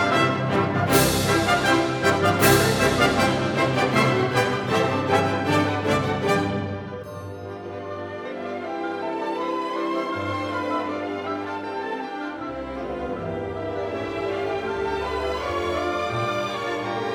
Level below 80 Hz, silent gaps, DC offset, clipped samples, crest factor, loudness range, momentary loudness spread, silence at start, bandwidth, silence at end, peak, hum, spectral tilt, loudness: -46 dBFS; none; under 0.1%; under 0.1%; 20 dB; 10 LU; 12 LU; 0 s; over 20 kHz; 0 s; -4 dBFS; none; -5 dB/octave; -23 LUFS